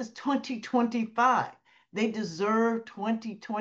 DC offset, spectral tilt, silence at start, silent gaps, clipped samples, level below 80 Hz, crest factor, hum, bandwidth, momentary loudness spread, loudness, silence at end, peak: under 0.1%; -5.5 dB/octave; 0 s; none; under 0.1%; -80 dBFS; 16 dB; none; 7.6 kHz; 9 LU; -29 LUFS; 0 s; -12 dBFS